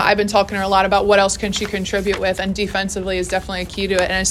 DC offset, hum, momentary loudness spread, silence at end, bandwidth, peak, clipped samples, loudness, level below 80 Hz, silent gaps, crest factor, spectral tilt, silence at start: under 0.1%; none; 7 LU; 0 s; 15 kHz; 0 dBFS; under 0.1%; -18 LUFS; -36 dBFS; none; 18 dB; -3.5 dB/octave; 0 s